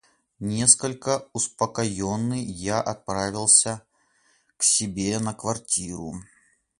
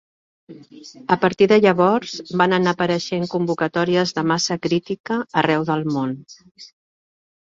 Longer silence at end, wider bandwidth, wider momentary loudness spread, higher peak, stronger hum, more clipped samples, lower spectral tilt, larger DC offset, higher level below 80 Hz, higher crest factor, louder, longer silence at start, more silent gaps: second, 0.55 s vs 0.8 s; first, 11.5 kHz vs 7.8 kHz; first, 15 LU vs 10 LU; about the same, -2 dBFS vs -2 dBFS; neither; neither; second, -3 dB/octave vs -5.5 dB/octave; neither; first, -54 dBFS vs -60 dBFS; first, 24 dB vs 18 dB; second, -22 LUFS vs -19 LUFS; about the same, 0.4 s vs 0.5 s; second, none vs 5.00-5.04 s